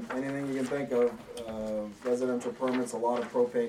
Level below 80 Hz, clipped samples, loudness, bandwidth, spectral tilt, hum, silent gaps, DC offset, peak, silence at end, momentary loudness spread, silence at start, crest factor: -64 dBFS; under 0.1%; -32 LUFS; 14 kHz; -5.5 dB/octave; none; none; under 0.1%; -16 dBFS; 0 s; 6 LU; 0 s; 16 dB